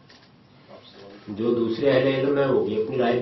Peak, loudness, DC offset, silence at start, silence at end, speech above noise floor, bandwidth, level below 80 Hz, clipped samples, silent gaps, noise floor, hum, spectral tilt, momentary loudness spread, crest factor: -8 dBFS; -23 LUFS; under 0.1%; 0.7 s; 0 s; 31 dB; 6 kHz; -62 dBFS; under 0.1%; none; -53 dBFS; none; -8.5 dB/octave; 9 LU; 16 dB